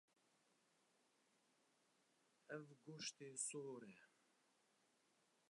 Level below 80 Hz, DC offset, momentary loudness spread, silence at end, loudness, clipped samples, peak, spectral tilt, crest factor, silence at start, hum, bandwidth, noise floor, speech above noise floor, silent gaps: under -90 dBFS; under 0.1%; 14 LU; 1.4 s; -52 LUFS; under 0.1%; -34 dBFS; -2.5 dB/octave; 24 dB; 2.5 s; none; 11 kHz; -82 dBFS; 28 dB; none